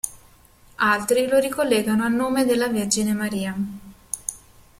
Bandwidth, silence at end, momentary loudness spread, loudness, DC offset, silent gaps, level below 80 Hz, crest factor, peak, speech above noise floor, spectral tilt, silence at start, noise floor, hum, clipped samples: 16.5 kHz; 0.45 s; 12 LU; -22 LUFS; under 0.1%; none; -54 dBFS; 18 dB; -4 dBFS; 31 dB; -4 dB/octave; 0.05 s; -52 dBFS; none; under 0.1%